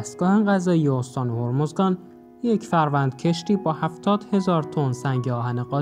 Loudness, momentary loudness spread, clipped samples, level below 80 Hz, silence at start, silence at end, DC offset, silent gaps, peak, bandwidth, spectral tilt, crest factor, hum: -23 LUFS; 6 LU; under 0.1%; -64 dBFS; 0 s; 0 s; under 0.1%; none; -6 dBFS; 11 kHz; -7.5 dB/octave; 16 dB; none